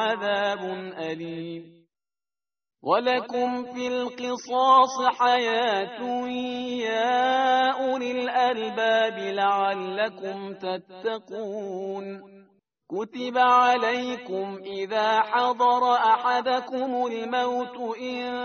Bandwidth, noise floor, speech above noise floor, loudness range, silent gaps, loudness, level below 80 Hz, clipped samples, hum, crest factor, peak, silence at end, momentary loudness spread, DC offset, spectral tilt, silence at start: 6.6 kHz; under -90 dBFS; over 65 dB; 7 LU; none; -25 LUFS; -74 dBFS; under 0.1%; none; 18 dB; -6 dBFS; 0 s; 13 LU; under 0.1%; -1 dB/octave; 0 s